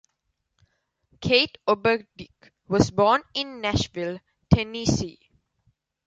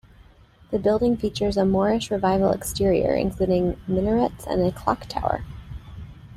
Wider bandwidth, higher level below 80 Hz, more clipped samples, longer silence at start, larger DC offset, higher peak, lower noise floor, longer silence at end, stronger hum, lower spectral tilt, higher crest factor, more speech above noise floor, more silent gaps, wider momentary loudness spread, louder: second, 9.2 kHz vs 15 kHz; about the same, -44 dBFS vs -40 dBFS; neither; first, 1.2 s vs 0.7 s; neither; about the same, -2 dBFS vs -4 dBFS; first, -77 dBFS vs -52 dBFS; first, 0.95 s vs 0 s; neither; second, -5 dB/octave vs -6.5 dB/octave; about the same, 24 dB vs 20 dB; first, 53 dB vs 30 dB; neither; about the same, 13 LU vs 13 LU; about the same, -24 LUFS vs -23 LUFS